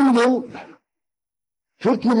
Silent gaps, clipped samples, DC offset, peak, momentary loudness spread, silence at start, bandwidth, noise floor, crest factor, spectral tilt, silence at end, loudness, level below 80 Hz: none; under 0.1%; under 0.1%; -8 dBFS; 20 LU; 0 s; 11 kHz; under -90 dBFS; 14 dB; -6 dB/octave; 0 s; -20 LUFS; -66 dBFS